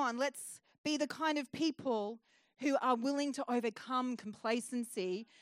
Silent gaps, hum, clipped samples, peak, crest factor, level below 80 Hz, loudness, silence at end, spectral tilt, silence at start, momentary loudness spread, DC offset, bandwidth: 0.78-0.84 s; none; under 0.1%; -20 dBFS; 18 dB; -90 dBFS; -37 LUFS; 0.2 s; -3.5 dB/octave; 0 s; 7 LU; under 0.1%; 16 kHz